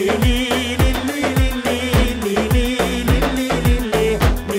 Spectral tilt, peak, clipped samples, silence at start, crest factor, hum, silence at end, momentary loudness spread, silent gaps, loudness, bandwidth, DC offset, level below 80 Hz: -5.5 dB/octave; -2 dBFS; under 0.1%; 0 s; 14 dB; none; 0 s; 2 LU; none; -18 LUFS; 16.5 kHz; under 0.1%; -22 dBFS